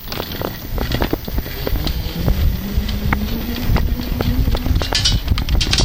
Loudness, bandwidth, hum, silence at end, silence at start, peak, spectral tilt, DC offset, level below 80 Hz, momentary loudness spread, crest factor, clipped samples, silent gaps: -20 LUFS; 17.5 kHz; none; 0 s; 0 s; 0 dBFS; -4.5 dB/octave; under 0.1%; -20 dBFS; 8 LU; 18 dB; under 0.1%; none